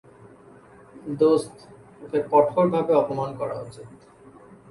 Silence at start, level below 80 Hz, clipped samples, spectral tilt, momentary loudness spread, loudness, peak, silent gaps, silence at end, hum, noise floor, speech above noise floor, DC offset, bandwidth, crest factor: 0.95 s; -64 dBFS; under 0.1%; -7.5 dB/octave; 21 LU; -22 LUFS; -4 dBFS; none; 0.75 s; none; -49 dBFS; 27 dB; under 0.1%; 11.5 kHz; 20 dB